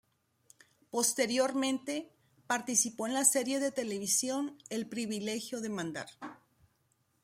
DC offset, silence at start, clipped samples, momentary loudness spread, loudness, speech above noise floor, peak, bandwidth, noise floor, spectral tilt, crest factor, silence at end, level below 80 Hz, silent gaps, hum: under 0.1%; 0.95 s; under 0.1%; 13 LU; -32 LUFS; 42 dB; -10 dBFS; 16 kHz; -75 dBFS; -2 dB/octave; 24 dB; 0.9 s; -80 dBFS; none; none